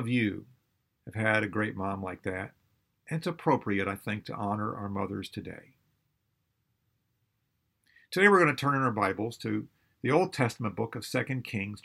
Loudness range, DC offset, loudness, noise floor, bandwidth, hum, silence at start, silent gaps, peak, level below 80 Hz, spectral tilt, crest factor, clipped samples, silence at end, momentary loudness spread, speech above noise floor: 11 LU; under 0.1%; -30 LUFS; -78 dBFS; 15.5 kHz; none; 0 s; none; -8 dBFS; -70 dBFS; -6 dB/octave; 24 dB; under 0.1%; 0.05 s; 14 LU; 48 dB